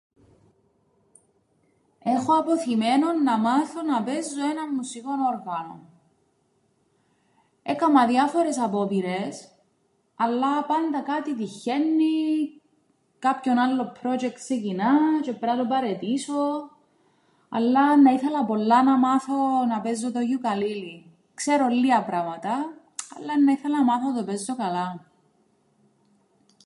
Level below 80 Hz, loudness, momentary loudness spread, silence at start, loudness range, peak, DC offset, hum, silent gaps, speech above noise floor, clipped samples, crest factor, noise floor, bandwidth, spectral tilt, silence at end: -78 dBFS; -24 LUFS; 12 LU; 2.05 s; 5 LU; -6 dBFS; under 0.1%; none; none; 45 dB; under 0.1%; 18 dB; -68 dBFS; 11.5 kHz; -5 dB/octave; 1.65 s